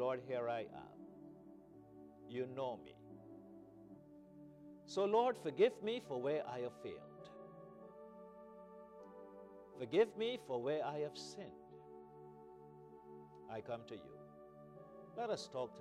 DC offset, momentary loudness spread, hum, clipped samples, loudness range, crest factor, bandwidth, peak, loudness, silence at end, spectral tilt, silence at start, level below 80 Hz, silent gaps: under 0.1%; 23 LU; 60 Hz at -80 dBFS; under 0.1%; 14 LU; 22 dB; 12 kHz; -22 dBFS; -41 LUFS; 0 s; -5.5 dB/octave; 0 s; -82 dBFS; none